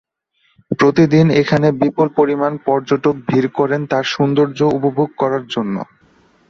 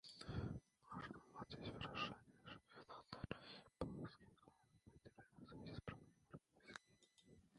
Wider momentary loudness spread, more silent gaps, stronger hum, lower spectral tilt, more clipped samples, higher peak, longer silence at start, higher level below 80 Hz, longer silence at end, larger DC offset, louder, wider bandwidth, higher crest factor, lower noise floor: second, 9 LU vs 15 LU; neither; neither; about the same, -7 dB/octave vs -6 dB/octave; neither; first, -2 dBFS vs -30 dBFS; first, 0.7 s vs 0.05 s; first, -54 dBFS vs -68 dBFS; first, 0.65 s vs 0 s; neither; first, -16 LUFS vs -54 LUFS; second, 7.2 kHz vs 11 kHz; second, 14 dB vs 26 dB; second, -62 dBFS vs -75 dBFS